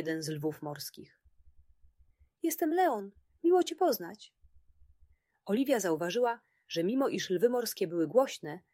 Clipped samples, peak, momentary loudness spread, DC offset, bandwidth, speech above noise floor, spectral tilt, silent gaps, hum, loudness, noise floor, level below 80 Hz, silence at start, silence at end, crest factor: under 0.1%; -14 dBFS; 14 LU; under 0.1%; 16 kHz; 35 dB; -4.5 dB/octave; none; none; -31 LUFS; -66 dBFS; -70 dBFS; 0 s; 0.15 s; 20 dB